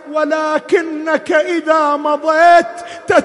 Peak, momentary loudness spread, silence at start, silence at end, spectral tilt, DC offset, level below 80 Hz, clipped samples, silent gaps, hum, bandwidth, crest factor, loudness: 0 dBFS; 9 LU; 0.05 s; 0 s; -4 dB/octave; under 0.1%; -56 dBFS; under 0.1%; none; none; 11.5 kHz; 14 dB; -13 LUFS